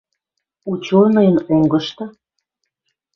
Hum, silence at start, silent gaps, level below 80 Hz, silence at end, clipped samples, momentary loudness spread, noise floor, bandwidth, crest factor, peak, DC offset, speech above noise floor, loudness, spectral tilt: none; 0.65 s; none; -56 dBFS; 1.05 s; under 0.1%; 20 LU; -76 dBFS; 6.8 kHz; 16 dB; -2 dBFS; under 0.1%; 61 dB; -15 LUFS; -8 dB/octave